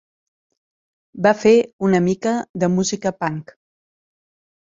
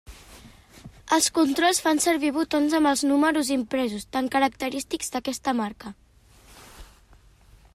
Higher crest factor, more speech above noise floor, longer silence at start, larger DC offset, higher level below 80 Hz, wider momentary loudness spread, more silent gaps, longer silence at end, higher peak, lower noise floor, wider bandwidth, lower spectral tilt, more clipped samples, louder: about the same, 20 dB vs 18 dB; first, over 72 dB vs 31 dB; first, 1.15 s vs 0.1 s; neither; second, -60 dBFS vs -54 dBFS; about the same, 10 LU vs 9 LU; first, 1.73-1.79 s, 2.49-2.54 s vs none; first, 1.25 s vs 0.9 s; first, -2 dBFS vs -8 dBFS; first, under -90 dBFS vs -54 dBFS; second, 7.8 kHz vs 15.5 kHz; first, -5.5 dB/octave vs -2.5 dB/octave; neither; first, -18 LUFS vs -23 LUFS